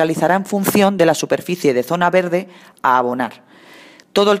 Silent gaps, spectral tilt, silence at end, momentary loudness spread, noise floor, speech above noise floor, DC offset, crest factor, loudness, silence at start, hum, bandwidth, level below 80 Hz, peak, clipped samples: none; -5 dB/octave; 0 s; 8 LU; -44 dBFS; 27 dB; under 0.1%; 16 dB; -17 LUFS; 0 s; none; 15.5 kHz; -62 dBFS; -2 dBFS; under 0.1%